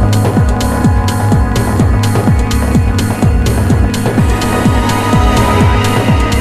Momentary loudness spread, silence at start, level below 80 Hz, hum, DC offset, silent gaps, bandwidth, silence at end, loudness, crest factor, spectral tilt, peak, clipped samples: 2 LU; 0 s; -16 dBFS; none; under 0.1%; none; 14 kHz; 0 s; -11 LUFS; 10 dB; -6 dB/octave; 0 dBFS; under 0.1%